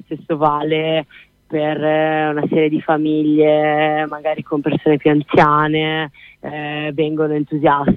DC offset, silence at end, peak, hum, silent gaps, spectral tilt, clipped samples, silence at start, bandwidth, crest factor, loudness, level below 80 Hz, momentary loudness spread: under 0.1%; 0 s; 0 dBFS; none; none; -8.5 dB/octave; under 0.1%; 0.1 s; 5.2 kHz; 16 dB; -17 LUFS; -48 dBFS; 10 LU